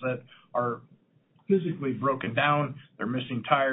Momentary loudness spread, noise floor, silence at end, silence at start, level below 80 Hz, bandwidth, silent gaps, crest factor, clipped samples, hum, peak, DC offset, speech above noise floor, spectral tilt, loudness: 10 LU; -65 dBFS; 0 s; 0 s; -68 dBFS; 4 kHz; none; 20 dB; under 0.1%; none; -10 dBFS; under 0.1%; 37 dB; -10.5 dB/octave; -29 LUFS